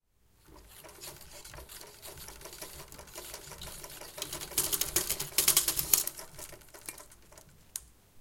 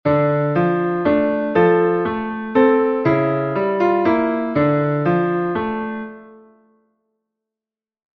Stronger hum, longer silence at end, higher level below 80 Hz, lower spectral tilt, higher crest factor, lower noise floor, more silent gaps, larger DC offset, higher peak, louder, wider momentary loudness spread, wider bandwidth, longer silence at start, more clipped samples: neither; second, 0 s vs 1.8 s; about the same, -56 dBFS vs -52 dBFS; second, 0 dB/octave vs -10 dB/octave; first, 34 dB vs 16 dB; second, -64 dBFS vs under -90 dBFS; neither; neither; about the same, -4 dBFS vs -2 dBFS; second, -29 LUFS vs -18 LUFS; first, 21 LU vs 7 LU; first, 17 kHz vs 5.8 kHz; first, 0.5 s vs 0.05 s; neither